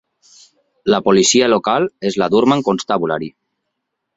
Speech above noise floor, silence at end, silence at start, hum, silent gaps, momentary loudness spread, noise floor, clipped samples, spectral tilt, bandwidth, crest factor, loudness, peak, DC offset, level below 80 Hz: 61 dB; 0.85 s; 0.85 s; none; none; 11 LU; -75 dBFS; under 0.1%; -4 dB/octave; 8 kHz; 16 dB; -15 LUFS; -2 dBFS; under 0.1%; -56 dBFS